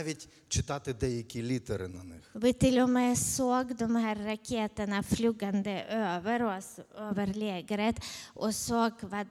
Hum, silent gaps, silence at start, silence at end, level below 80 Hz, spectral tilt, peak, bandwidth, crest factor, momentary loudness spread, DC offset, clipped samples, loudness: none; none; 0 s; 0 s; -52 dBFS; -4.5 dB/octave; -12 dBFS; 16 kHz; 20 dB; 12 LU; under 0.1%; under 0.1%; -31 LUFS